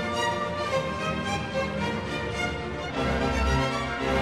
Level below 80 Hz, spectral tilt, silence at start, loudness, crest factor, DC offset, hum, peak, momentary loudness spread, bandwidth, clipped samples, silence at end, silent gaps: -38 dBFS; -5 dB/octave; 0 s; -28 LUFS; 16 dB; under 0.1%; none; -12 dBFS; 5 LU; 13.5 kHz; under 0.1%; 0 s; none